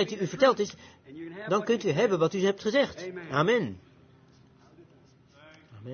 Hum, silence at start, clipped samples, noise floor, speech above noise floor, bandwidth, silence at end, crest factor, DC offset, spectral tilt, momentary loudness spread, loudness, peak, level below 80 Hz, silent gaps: none; 0 s; under 0.1%; -59 dBFS; 31 dB; 6.8 kHz; 0 s; 20 dB; under 0.1%; -5.5 dB/octave; 21 LU; -27 LUFS; -10 dBFS; -70 dBFS; none